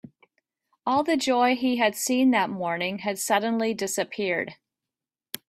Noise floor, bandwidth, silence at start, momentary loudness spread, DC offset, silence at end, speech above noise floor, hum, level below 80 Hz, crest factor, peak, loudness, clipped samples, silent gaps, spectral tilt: -89 dBFS; 15.5 kHz; 0.85 s; 7 LU; under 0.1%; 0.95 s; 65 dB; none; -72 dBFS; 18 dB; -8 dBFS; -25 LUFS; under 0.1%; none; -3.5 dB/octave